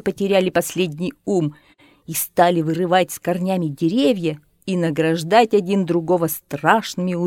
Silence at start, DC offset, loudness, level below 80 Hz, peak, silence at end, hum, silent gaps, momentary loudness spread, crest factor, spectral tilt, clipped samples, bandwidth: 0.05 s; under 0.1%; -19 LUFS; -60 dBFS; 0 dBFS; 0 s; none; none; 8 LU; 18 dB; -5.5 dB/octave; under 0.1%; 17.5 kHz